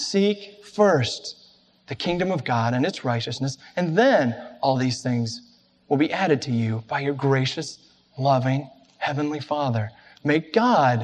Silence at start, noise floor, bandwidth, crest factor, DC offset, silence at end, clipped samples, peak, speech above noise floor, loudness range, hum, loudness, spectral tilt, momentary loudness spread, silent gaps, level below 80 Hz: 0 s; -56 dBFS; 9.8 kHz; 18 dB; under 0.1%; 0 s; under 0.1%; -6 dBFS; 33 dB; 2 LU; none; -23 LUFS; -6 dB/octave; 12 LU; none; -62 dBFS